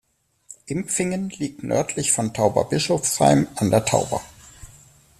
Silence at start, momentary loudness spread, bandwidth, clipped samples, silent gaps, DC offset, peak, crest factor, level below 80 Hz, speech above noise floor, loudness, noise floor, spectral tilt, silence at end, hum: 0.5 s; 12 LU; 14.5 kHz; under 0.1%; none; under 0.1%; -2 dBFS; 20 dB; -52 dBFS; 30 dB; -21 LUFS; -51 dBFS; -4.5 dB/octave; 0.55 s; none